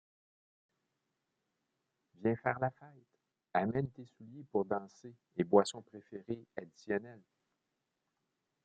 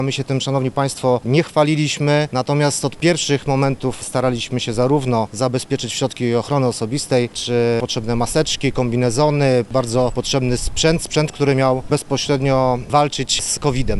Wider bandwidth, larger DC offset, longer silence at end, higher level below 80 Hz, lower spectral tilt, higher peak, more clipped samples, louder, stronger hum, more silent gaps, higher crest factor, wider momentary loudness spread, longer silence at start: second, 8 kHz vs 12 kHz; neither; first, 1.45 s vs 0 s; second, -76 dBFS vs -36 dBFS; about the same, -5.5 dB/octave vs -5 dB/octave; second, -12 dBFS vs -2 dBFS; neither; second, -36 LUFS vs -18 LUFS; neither; neither; first, 28 dB vs 16 dB; first, 23 LU vs 4 LU; first, 2.2 s vs 0 s